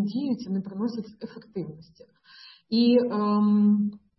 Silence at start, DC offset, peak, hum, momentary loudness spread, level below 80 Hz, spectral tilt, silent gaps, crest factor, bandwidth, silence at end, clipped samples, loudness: 0 s; under 0.1%; -10 dBFS; none; 17 LU; -72 dBFS; -9 dB/octave; none; 16 dB; 6 kHz; 0.2 s; under 0.1%; -24 LUFS